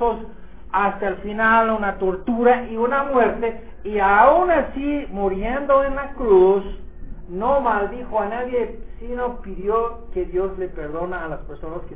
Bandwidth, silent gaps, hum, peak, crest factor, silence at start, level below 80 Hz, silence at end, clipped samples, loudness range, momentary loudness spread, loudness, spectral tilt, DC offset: 4 kHz; none; none; -2 dBFS; 18 dB; 0 s; -38 dBFS; 0 s; under 0.1%; 7 LU; 16 LU; -20 LUFS; -10 dB/octave; 2%